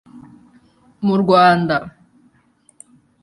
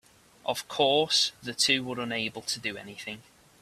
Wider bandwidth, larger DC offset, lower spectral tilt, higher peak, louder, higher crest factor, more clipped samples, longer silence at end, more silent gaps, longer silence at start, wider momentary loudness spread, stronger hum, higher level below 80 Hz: second, 11.5 kHz vs 15.5 kHz; neither; first, -7 dB/octave vs -2 dB/octave; first, -2 dBFS vs -10 dBFS; first, -15 LUFS vs -27 LUFS; about the same, 18 dB vs 20 dB; neither; first, 1.35 s vs 0.4 s; neither; second, 0.15 s vs 0.45 s; second, 11 LU vs 16 LU; neither; first, -56 dBFS vs -68 dBFS